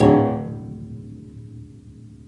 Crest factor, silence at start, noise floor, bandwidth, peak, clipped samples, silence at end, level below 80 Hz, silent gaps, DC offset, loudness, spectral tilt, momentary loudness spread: 22 dB; 0 s; -43 dBFS; 10 kHz; -2 dBFS; under 0.1%; 0.1 s; -46 dBFS; none; under 0.1%; -22 LUFS; -9 dB/octave; 25 LU